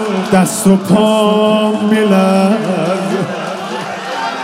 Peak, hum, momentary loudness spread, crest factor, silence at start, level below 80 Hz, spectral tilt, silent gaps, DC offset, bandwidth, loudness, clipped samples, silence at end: 0 dBFS; none; 10 LU; 12 dB; 0 s; -54 dBFS; -5.5 dB/octave; none; under 0.1%; 16 kHz; -13 LUFS; under 0.1%; 0 s